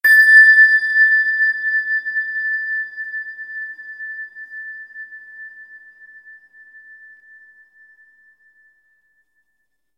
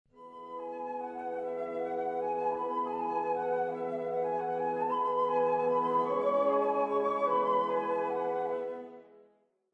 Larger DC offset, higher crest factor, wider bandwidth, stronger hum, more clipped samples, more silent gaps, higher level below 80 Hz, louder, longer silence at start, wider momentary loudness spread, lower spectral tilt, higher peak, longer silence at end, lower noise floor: neither; about the same, 18 dB vs 14 dB; first, 15 kHz vs 6 kHz; neither; neither; neither; about the same, -84 dBFS vs -80 dBFS; first, -12 LUFS vs -32 LUFS; about the same, 0.05 s vs 0.15 s; first, 27 LU vs 10 LU; second, 2.5 dB/octave vs -7 dB/octave; first, -2 dBFS vs -18 dBFS; first, 4.2 s vs 0.6 s; first, -73 dBFS vs -68 dBFS